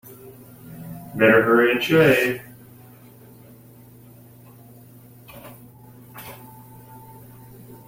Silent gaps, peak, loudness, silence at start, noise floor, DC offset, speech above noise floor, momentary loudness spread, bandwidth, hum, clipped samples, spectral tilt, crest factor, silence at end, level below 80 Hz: none; -4 dBFS; -17 LUFS; 0.1 s; -47 dBFS; under 0.1%; 30 dB; 28 LU; 16.5 kHz; none; under 0.1%; -6 dB/octave; 22 dB; 0.9 s; -58 dBFS